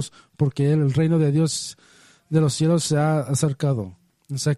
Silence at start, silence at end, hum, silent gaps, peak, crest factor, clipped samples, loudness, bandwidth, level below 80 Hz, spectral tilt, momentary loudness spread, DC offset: 0 s; 0 s; none; none; -6 dBFS; 14 dB; under 0.1%; -21 LUFS; 12 kHz; -58 dBFS; -6 dB/octave; 10 LU; under 0.1%